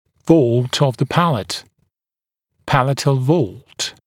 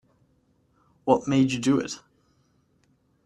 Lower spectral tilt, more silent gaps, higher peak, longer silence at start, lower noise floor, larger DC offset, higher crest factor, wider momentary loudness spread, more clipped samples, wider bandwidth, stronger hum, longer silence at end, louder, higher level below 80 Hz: about the same, -6 dB/octave vs -6 dB/octave; neither; first, 0 dBFS vs -4 dBFS; second, 0.25 s vs 1.05 s; first, under -90 dBFS vs -66 dBFS; neither; second, 18 dB vs 24 dB; about the same, 11 LU vs 13 LU; neither; first, 16 kHz vs 11 kHz; neither; second, 0.15 s vs 1.3 s; first, -17 LUFS vs -24 LUFS; first, -50 dBFS vs -62 dBFS